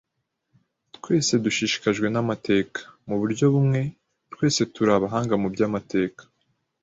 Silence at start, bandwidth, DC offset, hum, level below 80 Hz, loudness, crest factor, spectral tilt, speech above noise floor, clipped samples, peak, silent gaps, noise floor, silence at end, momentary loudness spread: 1.05 s; 8 kHz; under 0.1%; none; -58 dBFS; -23 LUFS; 18 dB; -5 dB/octave; 54 dB; under 0.1%; -6 dBFS; none; -77 dBFS; 0.6 s; 9 LU